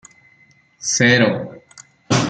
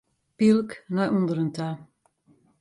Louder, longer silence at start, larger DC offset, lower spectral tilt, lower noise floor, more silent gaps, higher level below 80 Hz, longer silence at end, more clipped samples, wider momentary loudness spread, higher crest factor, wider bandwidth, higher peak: first, -16 LUFS vs -25 LUFS; first, 0.8 s vs 0.4 s; neither; second, -4 dB/octave vs -7.5 dB/octave; second, -54 dBFS vs -63 dBFS; neither; first, -58 dBFS vs -66 dBFS; second, 0 s vs 0.75 s; neither; about the same, 14 LU vs 12 LU; about the same, 18 dB vs 16 dB; second, 9.4 kHz vs 11 kHz; first, -2 dBFS vs -10 dBFS